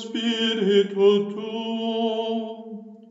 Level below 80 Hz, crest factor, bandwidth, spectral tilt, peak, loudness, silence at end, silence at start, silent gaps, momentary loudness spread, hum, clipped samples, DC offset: under -90 dBFS; 16 dB; 7.8 kHz; -5.5 dB/octave; -8 dBFS; -23 LUFS; 0.05 s; 0 s; none; 17 LU; none; under 0.1%; under 0.1%